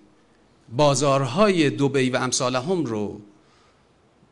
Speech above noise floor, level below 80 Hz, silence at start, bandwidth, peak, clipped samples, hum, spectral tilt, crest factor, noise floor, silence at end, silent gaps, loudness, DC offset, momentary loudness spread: 38 dB; -56 dBFS; 0.7 s; 11 kHz; -6 dBFS; under 0.1%; none; -4.5 dB/octave; 18 dB; -59 dBFS; 1.1 s; none; -21 LUFS; under 0.1%; 12 LU